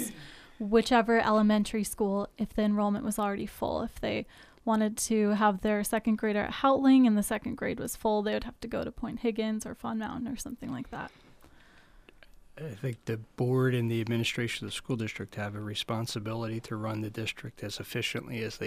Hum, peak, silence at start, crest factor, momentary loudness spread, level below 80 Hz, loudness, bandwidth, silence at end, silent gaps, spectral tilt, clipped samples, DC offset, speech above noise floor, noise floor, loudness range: none; -12 dBFS; 0 s; 18 dB; 13 LU; -54 dBFS; -30 LUFS; 15.5 kHz; 0 s; none; -5.5 dB/octave; under 0.1%; under 0.1%; 27 dB; -57 dBFS; 10 LU